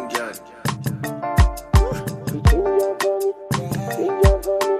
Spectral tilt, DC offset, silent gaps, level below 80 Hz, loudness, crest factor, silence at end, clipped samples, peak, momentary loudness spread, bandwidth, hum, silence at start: -6 dB/octave; under 0.1%; none; -24 dBFS; -21 LUFS; 18 dB; 0 s; under 0.1%; -2 dBFS; 10 LU; 16 kHz; none; 0 s